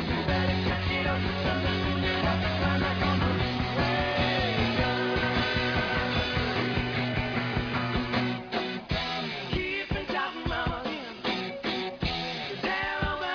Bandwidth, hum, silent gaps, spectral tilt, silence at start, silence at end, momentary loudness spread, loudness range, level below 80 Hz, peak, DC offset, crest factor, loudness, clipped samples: 5.4 kHz; none; none; -6.5 dB/octave; 0 s; 0 s; 5 LU; 4 LU; -40 dBFS; -12 dBFS; under 0.1%; 16 dB; -28 LUFS; under 0.1%